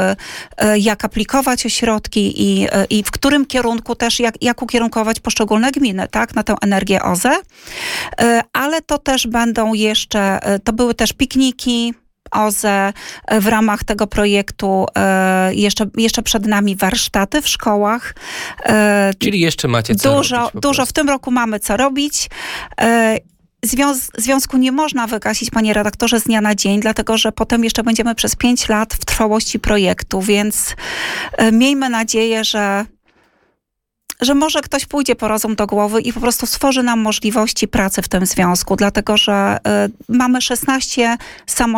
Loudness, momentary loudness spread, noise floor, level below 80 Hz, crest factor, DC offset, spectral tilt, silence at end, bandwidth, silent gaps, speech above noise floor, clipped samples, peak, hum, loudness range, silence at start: -15 LUFS; 5 LU; -76 dBFS; -36 dBFS; 14 dB; under 0.1%; -3.5 dB/octave; 0 s; 18.5 kHz; none; 61 dB; under 0.1%; -2 dBFS; none; 2 LU; 0 s